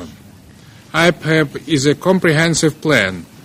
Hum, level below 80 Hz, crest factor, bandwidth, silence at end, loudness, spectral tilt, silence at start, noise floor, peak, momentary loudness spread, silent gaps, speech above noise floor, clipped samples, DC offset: none; -48 dBFS; 16 dB; 16 kHz; 0.2 s; -15 LUFS; -4.5 dB/octave; 0 s; -41 dBFS; 0 dBFS; 4 LU; none; 27 dB; under 0.1%; under 0.1%